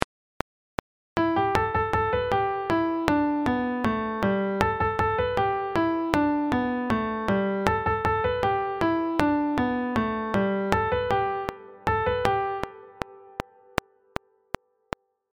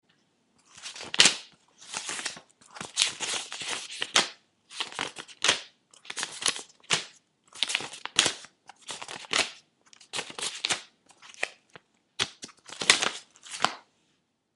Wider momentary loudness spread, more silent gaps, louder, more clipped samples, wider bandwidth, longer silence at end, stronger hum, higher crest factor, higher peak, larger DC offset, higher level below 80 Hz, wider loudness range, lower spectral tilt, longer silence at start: second, 15 LU vs 20 LU; first, 0.04-1.16 s vs none; about the same, -26 LUFS vs -28 LUFS; neither; first, 16.5 kHz vs 11.5 kHz; first, 2 s vs 0.75 s; neither; second, 26 dB vs 32 dB; about the same, 0 dBFS vs 0 dBFS; neither; first, -46 dBFS vs -72 dBFS; about the same, 4 LU vs 5 LU; first, -6.5 dB/octave vs 0.5 dB/octave; second, 0 s vs 0.75 s